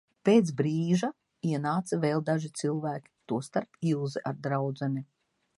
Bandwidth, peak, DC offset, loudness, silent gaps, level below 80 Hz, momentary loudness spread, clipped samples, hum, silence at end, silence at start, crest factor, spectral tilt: 11.5 kHz; -10 dBFS; under 0.1%; -30 LUFS; none; -74 dBFS; 11 LU; under 0.1%; none; 0.55 s; 0.25 s; 20 dB; -7 dB/octave